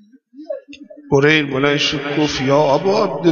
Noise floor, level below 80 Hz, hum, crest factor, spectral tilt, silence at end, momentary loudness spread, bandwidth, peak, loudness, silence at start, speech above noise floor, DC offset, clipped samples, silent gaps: -41 dBFS; -50 dBFS; none; 16 dB; -5 dB/octave; 0 s; 17 LU; 7.4 kHz; -2 dBFS; -15 LUFS; 0.4 s; 25 dB; under 0.1%; under 0.1%; none